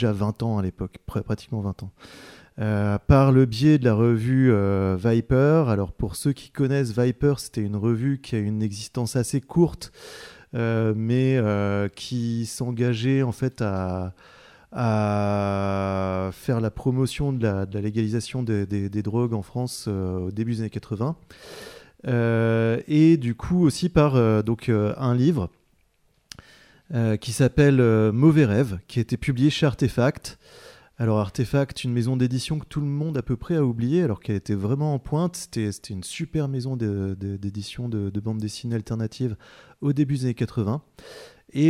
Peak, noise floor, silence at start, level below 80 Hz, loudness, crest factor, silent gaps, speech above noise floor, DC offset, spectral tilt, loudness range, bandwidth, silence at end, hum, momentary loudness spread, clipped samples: -2 dBFS; -65 dBFS; 0 s; -46 dBFS; -24 LUFS; 20 dB; none; 42 dB; under 0.1%; -7 dB/octave; 7 LU; 15 kHz; 0 s; none; 12 LU; under 0.1%